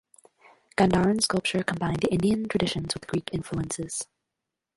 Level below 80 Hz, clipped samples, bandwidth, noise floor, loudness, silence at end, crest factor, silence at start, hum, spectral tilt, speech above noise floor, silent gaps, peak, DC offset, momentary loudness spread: -50 dBFS; under 0.1%; 11.5 kHz; -85 dBFS; -26 LUFS; 0.7 s; 20 dB; 0.8 s; none; -5 dB/octave; 60 dB; none; -6 dBFS; under 0.1%; 10 LU